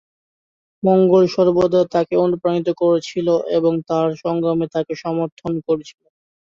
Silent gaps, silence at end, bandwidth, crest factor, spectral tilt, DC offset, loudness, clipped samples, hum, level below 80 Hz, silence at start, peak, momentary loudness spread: 5.32-5.37 s; 0.6 s; 7.4 kHz; 16 dB; -7.5 dB/octave; under 0.1%; -18 LUFS; under 0.1%; none; -58 dBFS; 0.85 s; -2 dBFS; 9 LU